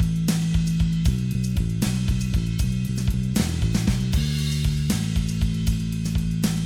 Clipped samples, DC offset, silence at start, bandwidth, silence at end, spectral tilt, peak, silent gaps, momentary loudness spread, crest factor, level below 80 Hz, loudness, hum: under 0.1%; under 0.1%; 0 s; 20 kHz; 0 s; -5.5 dB/octave; -8 dBFS; none; 3 LU; 14 dB; -28 dBFS; -24 LUFS; none